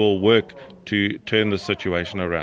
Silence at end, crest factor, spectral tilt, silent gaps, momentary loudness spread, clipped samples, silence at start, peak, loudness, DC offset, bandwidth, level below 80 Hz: 0 s; 18 dB; -6.5 dB/octave; none; 8 LU; under 0.1%; 0 s; -4 dBFS; -21 LUFS; under 0.1%; 7.6 kHz; -56 dBFS